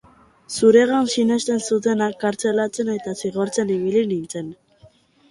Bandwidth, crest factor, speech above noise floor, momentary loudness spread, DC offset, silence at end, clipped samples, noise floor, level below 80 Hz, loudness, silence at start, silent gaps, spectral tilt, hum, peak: 11.5 kHz; 18 dB; 33 dB; 12 LU; under 0.1%; 0.75 s; under 0.1%; -53 dBFS; -62 dBFS; -20 LUFS; 0.5 s; none; -4.5 dB/octave; none; -2 dBFS